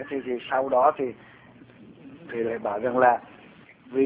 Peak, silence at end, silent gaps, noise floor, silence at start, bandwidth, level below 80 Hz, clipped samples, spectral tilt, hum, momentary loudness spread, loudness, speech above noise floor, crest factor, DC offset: -6 dBFS; 0 s; none; -51 dBFS; 0 s; 4 kHz; -66 dBFS; under 0.1%; -9.5 dB/octave; none; 13 LU; -25 LUFS; 26 dB; 20 dB; under 0.1%